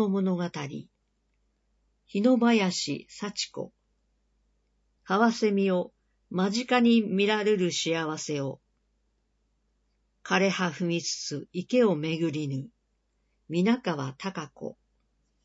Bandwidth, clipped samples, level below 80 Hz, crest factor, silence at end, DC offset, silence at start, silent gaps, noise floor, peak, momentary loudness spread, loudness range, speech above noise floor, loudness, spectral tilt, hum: 8 kHz; under 0.1%; -72 dBFS; 20 dB; 0.7 s; under 0.1%; 0 s; none; -74 dBFS; -10 dBFS; 15 LU; 5 LU; 47 dB; -27 LUFS; -5 dB/octave; none